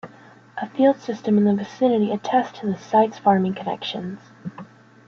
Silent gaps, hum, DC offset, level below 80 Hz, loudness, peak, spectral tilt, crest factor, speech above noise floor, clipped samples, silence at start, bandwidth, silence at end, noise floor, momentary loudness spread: none; none; under 0.1%; -66 dBFS; -21 LUFS; -4 dBFS; -7 dB/octave; 18 dB; 28 dB; under 0.1%; 0.05 s; 7 kHz; 0.45 s; -48 dBFS; 17 LU